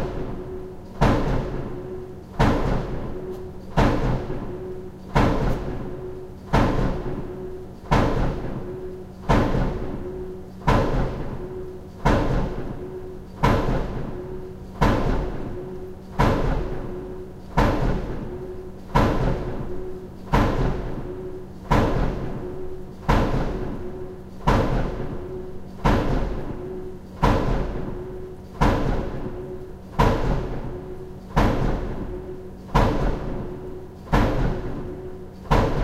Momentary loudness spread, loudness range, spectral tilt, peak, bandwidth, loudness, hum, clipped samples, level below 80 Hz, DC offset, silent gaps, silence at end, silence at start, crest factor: 15 LU; 1 LU; -7.5 dB/octave; -4 dBFS; 13.5 kHz; -26 LUFS; none; under 0.1%; -28 dBFS; under 0.1%; none; 0 s; 0 s; 20 dB